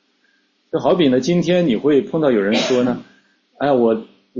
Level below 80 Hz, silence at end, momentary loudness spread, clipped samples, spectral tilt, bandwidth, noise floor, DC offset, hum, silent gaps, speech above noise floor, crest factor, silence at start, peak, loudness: -56 dBFS; 0 s; 8 LU; under 0.1%; -6 dB/octave; 7.6 kHz; -61 dBFS; under 0.1%; none; none; 46 dB; 14 dB; 0.75 s; -4 dBFS; -17 LUFS